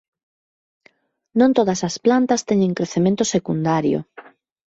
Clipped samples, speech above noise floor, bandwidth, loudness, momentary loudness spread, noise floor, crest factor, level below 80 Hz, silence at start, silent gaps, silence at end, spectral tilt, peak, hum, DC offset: under 0.1%; 40 dB; 8 kHz; -19 LUFS; 5 LU; -58 dBFS; 16 dB; -58 dBFS; 1.35 s; none; 0.45 s; -5.5 dB/octave; -4 dBFS; none; under 0.1%